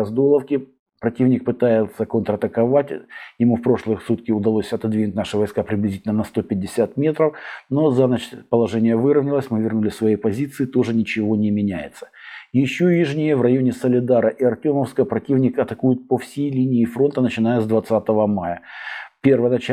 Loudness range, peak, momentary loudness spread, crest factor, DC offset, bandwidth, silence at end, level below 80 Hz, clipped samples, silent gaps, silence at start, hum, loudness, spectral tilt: 3 LU; -2 dBFS; 8 LU; 18 dB; under 0.1%; 13.5 kHz; 0 s; -58 dBFS; under 0.1%; 0.79-0.86 s; 0 s; none; -20 LUFS; -8 dB/octave